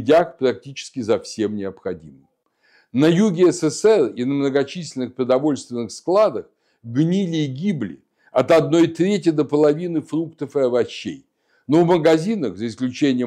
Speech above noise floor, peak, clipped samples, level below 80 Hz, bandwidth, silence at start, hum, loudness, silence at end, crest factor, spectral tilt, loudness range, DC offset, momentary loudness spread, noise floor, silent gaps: 41 dB; -4 dBFS; under 0.1%; -64 dBFS; 11 kHz; 0 s; none; -19 LUFS; 0 s; 16 dB; -6.5 dB/octave; 3 LU; under 0.1%; 12 LU; -59 dBFS; none